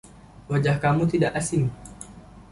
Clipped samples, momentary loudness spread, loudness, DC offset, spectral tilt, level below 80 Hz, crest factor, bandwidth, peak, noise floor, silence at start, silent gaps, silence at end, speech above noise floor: under 0.1%; 20 LU; -23 LUFS; under 0.1%; -6.5 dB/octave; -48 dBFS; 16 dB; 11.5 kHz; -8 dBFS; -44 dBFS; 0.05 s; none; 0.1 s; 21 dB